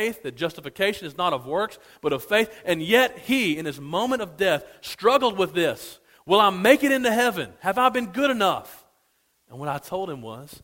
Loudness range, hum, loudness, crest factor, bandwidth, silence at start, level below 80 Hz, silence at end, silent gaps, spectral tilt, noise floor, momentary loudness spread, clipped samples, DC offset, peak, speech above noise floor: 3 LU; none; -23 LUFS; 22 dB; 16.5 kHz; 0 s; -60 dBFS; 0.05 s; none; -4 dB/octave; -68 dBFS; 13 LU; under 0.1%; under 0.1%; -2 dBFS; 44 dB